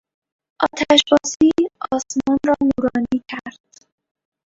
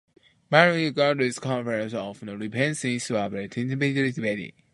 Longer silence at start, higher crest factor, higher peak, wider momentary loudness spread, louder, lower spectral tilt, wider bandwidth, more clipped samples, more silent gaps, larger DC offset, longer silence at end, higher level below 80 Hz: about the same, 0.6 s vs 0.5 s; about the same, 20 dB vs 24 dB; about the same, 0 dBFS vs 0 dBFS; about the same, 11 LU vs 13 LU; first, -18 LUFS vs -25 LUFS; second, -3 dB/octave vs -5 dB/octave; second, 8 kHz vs 11.5 kHz; neither; first, 1.36-1.40 s vs none; neither; first, 1 s vs 0.25 s; first, -50 dBFS vs -66 dBFS